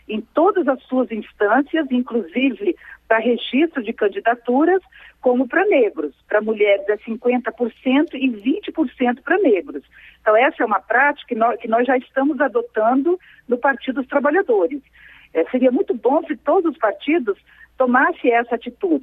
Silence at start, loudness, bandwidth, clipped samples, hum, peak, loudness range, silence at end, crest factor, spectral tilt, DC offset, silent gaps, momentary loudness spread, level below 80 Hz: 0.1 s; -19 LUFS; 4 kHz; under 0.1%; none; -2 dBFS; 2 LU; 0 s; 18 dB; -7.5 dB/octave; under 0.1%; none; 7 LU; -60 dBFS